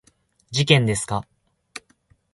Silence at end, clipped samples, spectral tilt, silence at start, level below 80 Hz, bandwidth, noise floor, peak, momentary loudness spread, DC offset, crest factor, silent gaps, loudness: 0.55 s; under 0.1%; -4.5 dB/octave; 0.5 s; -52 dBFS; 11.5 kHz; -62 dBFS; 0 dBFS; 23 LU; under 0.1%; 24 dB; none; -21 LUFS